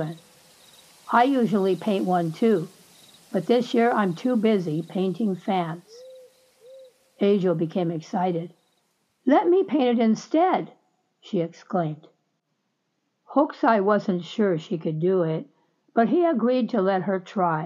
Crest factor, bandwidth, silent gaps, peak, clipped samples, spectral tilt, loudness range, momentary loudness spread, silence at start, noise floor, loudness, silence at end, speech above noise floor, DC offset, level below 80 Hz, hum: 18 dB; 13 kHz; none; -6 dBFS; under 0.1%; -7.5 dB/octave; 4 LU; 9 LU; 0 s; -75 dBFS; -23 LUFS; 0 s; 53 dB; under 0.1%; -82 dBFS; none